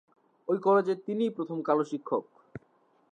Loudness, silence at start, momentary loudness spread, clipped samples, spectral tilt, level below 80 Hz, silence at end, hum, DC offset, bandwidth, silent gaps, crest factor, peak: -29 LUFS; 0.5 s; 24 LU; under 0.1%; -7.5 dB/octave; -74 dBFS; 0.55 s; none; under 0.1%; 8.6 kHz; none; 18 dB; -12 dBFS